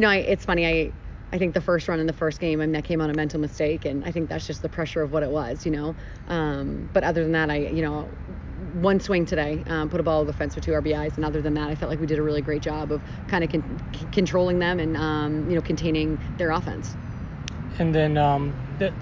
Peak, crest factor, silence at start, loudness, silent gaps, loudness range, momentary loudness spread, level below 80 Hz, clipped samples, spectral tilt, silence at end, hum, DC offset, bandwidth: -6 dBFS; 18 dB; 0 s; -25 LUFS; none; 2 LU; 11 LU; -38 dBFS; under 0.1%; -7 dB/octave; 0 s; none; under 0.1%; 7.6 kHz